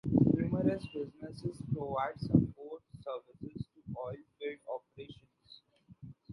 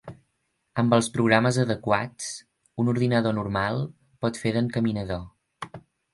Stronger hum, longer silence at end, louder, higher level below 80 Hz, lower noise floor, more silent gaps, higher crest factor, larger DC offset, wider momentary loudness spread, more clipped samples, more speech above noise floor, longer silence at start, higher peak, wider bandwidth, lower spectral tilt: neither; second, 0 s vs 0.35 s; second, -36 LUFS vs -25 LUFS; about the same, -56 dBFS vs -54 dBFS; second, -61 dBFS vs -75 dBFS; neither; about the same, 24 dB vs 22 dB; neither; about the same, 21 LU vs 19 LU; neither; second, 27 dB vs 51 dB; about the same, 0.05 s vs 0.05 s; second, -12 dBFS vs -4 dBFS; about the same, 11.5 kHz vs 11.5 kHz; first, -9.5 dB/octave vs -6 dB/octave